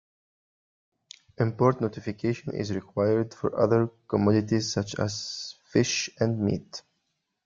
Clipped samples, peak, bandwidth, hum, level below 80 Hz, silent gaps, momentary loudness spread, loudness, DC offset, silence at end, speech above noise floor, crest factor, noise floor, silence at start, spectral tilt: under 0.1%; -8 dBFS; 7.6 kHz; none; -62 dBFS; none; 9 LU; -27 LUFS; under 0.1%; 0.65 s; 52 dB; 20 dB; -78 dBFS; 1.4 s; -5.5 dB/octave